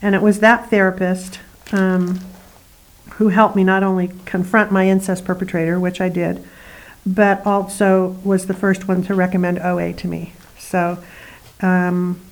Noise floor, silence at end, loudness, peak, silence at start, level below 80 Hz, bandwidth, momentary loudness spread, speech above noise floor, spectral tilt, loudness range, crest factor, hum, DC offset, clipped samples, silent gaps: -47 dBFS; 0.1 s; -17 LUFS; 0 dBFS; 0 s; -48 dBFS; 19.5 kHz; 12 LU; 30 dB; -7 dB/octave; 3 LU; 18 dB; none; under 0.1%; under 0.1%; none